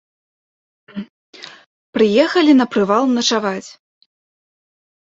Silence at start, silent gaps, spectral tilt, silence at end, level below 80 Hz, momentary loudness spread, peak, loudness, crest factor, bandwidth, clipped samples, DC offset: 0.95 s; 1.10-1.33 s, 1.66-1.93 s; -4 dB/octave; 1.4 s; -64 dBFS; 24 LU; -2 dBFS; -15 LUFS; 18 dB; 8 kHz; under 0.1%; under 0.1%